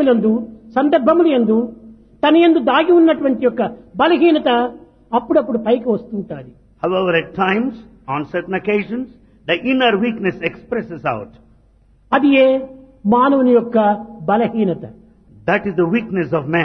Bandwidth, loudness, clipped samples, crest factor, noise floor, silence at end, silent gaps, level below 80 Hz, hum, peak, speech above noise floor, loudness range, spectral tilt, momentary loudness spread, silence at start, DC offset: 5.4 kHz; -16 LUFS; under 0.1%; 16 dB; -52 dBFS; 0 s; none; -52 dBFS; none; 0 dBFS; 36 dB; 6 LU; -8.5 dB/octave; 13 LU; 0 s; under 0.1%